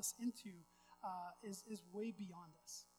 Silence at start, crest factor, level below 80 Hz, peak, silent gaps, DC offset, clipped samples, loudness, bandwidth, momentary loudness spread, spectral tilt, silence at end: 0 s; 18 dB; -86 dBFS; -32 dBFS; none; under 0.1%; under 0.1%; -50 LUFS; over 20 kHz; 11 LU; -3.5 dB/octave; 0.1 s